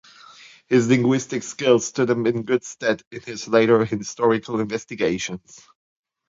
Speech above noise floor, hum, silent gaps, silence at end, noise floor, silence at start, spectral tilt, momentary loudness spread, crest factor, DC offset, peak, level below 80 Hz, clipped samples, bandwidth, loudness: 26 dB; none; 3.07-3.11 s; 0.9 s; -47 dBFS; 0.7 s; -5 dB/octave; 11 LU; 18 dB; under 0.1%; -4 dBFS; -60 dBFS; under 0.1%; 7.8 kHz; -21 LUFS